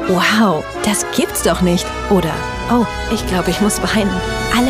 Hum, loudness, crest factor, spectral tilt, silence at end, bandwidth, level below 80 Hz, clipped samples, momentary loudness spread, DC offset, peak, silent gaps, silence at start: none; -16 LUFS; 14 dB; -4.5 dB/octave; 0 s; 15.5 kHz; -30 dBFS; under 0.1%; 5 LU; under 0.1%; -2 dBFS; none; 0 s